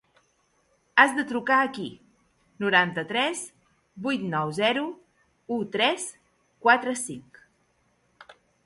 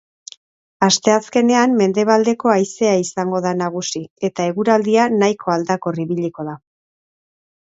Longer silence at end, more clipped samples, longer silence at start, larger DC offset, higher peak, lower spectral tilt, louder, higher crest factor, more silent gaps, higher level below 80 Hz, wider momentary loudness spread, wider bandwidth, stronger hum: second, 0.35 s vs 1.2 s; neither; first, 0.95 s vs 0.8 s; neither; about the same, -2 dBFS vs 0 dBFS; about the same, -3.5 dB/octave vs -4.5 dB/octave; second, -25 LUFS vs -17 LUFS; first, 26 dB vs 18 dB; second, none vs 4.11-4.16 s; second, -70 dBFS vs -64 dBFS; first, 15 LU vs 10 LU; first, 11.5 kHz vs 8 kHz; neither